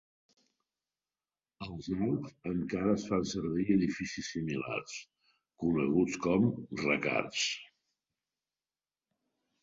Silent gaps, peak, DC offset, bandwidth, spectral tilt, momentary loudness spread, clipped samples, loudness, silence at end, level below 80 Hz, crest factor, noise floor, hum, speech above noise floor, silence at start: none; -14 dBFS; under 0.1%; 8 kHz; -5 dB/octave; 10 LU; under 0.1%; -33 LUFS; 1.95 s; -62 dBFS; 22 dB; under -90 dBFS; none; over 58 dB; 1.6 s